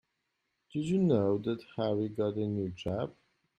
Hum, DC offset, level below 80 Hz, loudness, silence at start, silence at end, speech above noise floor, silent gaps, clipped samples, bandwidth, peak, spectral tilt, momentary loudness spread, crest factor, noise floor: none; under 0.1%; -66 dBFS; -32 LUFS; 0.75 s; 0.5 s; 51 dB; none; under 0.1%; 9 kHz; -14 dBFS; -8.5 dB/octave; 10 LU; 18 dB; -82 dBFS